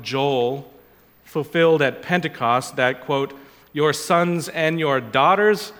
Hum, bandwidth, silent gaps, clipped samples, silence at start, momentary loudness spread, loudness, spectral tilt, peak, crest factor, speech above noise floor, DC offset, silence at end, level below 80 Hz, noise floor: none; 18.5 kHz; none; under 0.1%; 0 s; 9 LU; -20 LUFS; -5 dB/octave; -2 dBFS; 18 dB; 32 dB; under 0.1%; 0 s; -64 dBFS; -52 dBFS